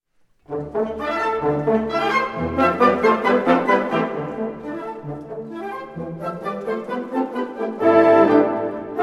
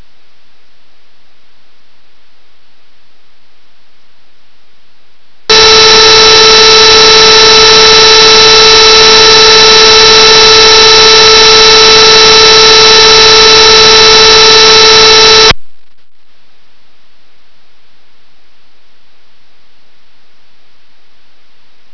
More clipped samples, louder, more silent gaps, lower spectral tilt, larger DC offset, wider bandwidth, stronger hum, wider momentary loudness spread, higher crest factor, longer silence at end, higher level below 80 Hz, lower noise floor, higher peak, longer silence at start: second, under 0.1% vs 5%; second, -20 LUFS vs 2 LUFS; neither; first, -7 dB/octave vs -0.5 dB/octave; second, under 0.1% vs 7%; first, 12 kHz vs 5.4 kHz; neither; first, 16 LU vs 0 LU; first, 18 dB vs 4 dB; second, 0 s vs 6.2 s; second, -52 dBFS vs -30 dBFS; first, -53 dBFS vs -49 dBFS; about the same, -2 dBFS vs 0 dBFS; second, 0.5 s vs 5.5 s